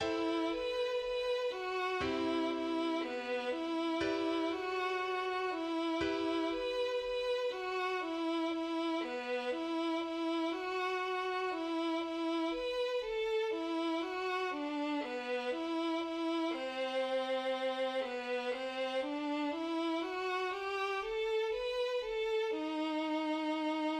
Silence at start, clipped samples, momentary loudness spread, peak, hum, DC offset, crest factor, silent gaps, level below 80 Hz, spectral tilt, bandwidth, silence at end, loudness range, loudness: 0 s; under 0.1%; 2 LU; -22 dBFS; none; under 0.1%; 14 dB; none; -66 dBFS; -4 dB/octave; 10.5 kHz; 0 s; 1 LU; -36 LUFS